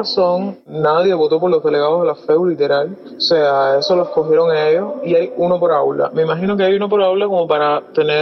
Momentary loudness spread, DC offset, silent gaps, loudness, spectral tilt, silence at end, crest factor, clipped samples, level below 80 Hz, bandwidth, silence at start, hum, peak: 3 LU; under 0.1%; none; -15 LUFS; -6.5 dB/octave; 0 s; 12 dB; under 0.1%; -62 dBFS; 6.4 kHz; 0 s; none; -2 dBFS